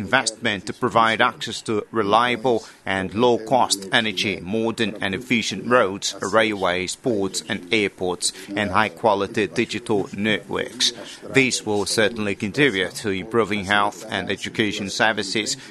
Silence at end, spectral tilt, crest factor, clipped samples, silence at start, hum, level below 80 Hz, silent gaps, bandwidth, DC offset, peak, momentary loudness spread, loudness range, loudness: 0 s; -3.5 dB/octave; 22 dB; under 0.1%; 0 s; none; -58 dBFS; none; 12.5 kHz; under 0.1%; 0 dBFS; 7 LU; 2 LU; -21 LUFS